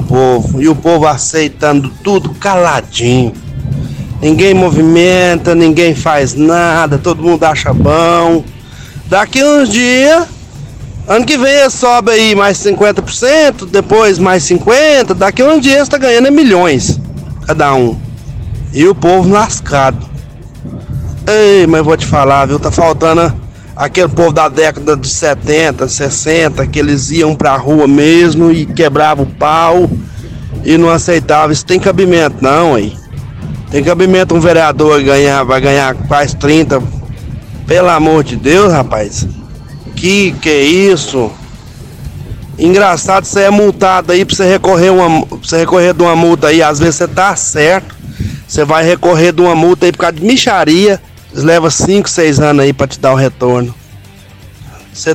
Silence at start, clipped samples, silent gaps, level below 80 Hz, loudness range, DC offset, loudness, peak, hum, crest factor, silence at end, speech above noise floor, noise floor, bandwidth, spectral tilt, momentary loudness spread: 0 s; under 0.1%; none; -30 dBFS; 3 LU; under 0.1%; -8 LUFS; 0 dBFS; none; 8 dB; 0 s; 26 dB; -34 dBFS; 15.5 kHz; -5 dB/octave; 15 LU